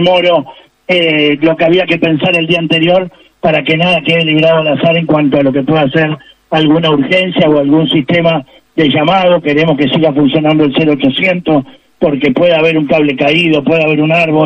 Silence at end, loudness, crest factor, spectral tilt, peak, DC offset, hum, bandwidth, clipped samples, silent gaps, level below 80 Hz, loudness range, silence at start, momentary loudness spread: 0 s; -10 LUFS; 10 dB; -7.5 dB/octave; 0 dBFS; under 0.1%; none; 8.8 kHz; under 0.1%; none; -48 dBFS; 1 LU; 0 s; 5 LU